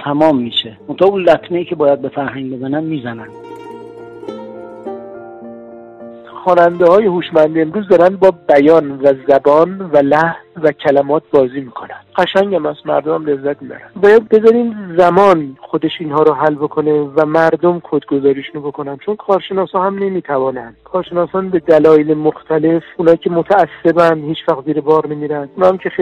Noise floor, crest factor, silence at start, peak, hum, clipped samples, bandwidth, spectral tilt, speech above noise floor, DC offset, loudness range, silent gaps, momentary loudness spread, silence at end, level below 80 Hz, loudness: -33 dBFS; 14 dB; 0 s; 0 dBFS; none; under 0.1%; 8.2 kHz; -7.5 dB/octave; 21 dB; under 0.1%; 8 LU; none; 19 LU; 0 s; -54 dBFS; -13 LUFS